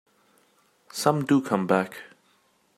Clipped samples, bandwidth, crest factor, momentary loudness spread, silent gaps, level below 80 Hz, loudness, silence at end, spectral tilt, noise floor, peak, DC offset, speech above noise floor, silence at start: under 0.1%; 15.5 kHz; 22 dB; 14 LU; none; -74 dBFS; -24 LUFS; 0.7 s; -5.5 dB/octave; -65 dBFS; -6 dBFS; under 0.1%; 42 dB; 0.95 s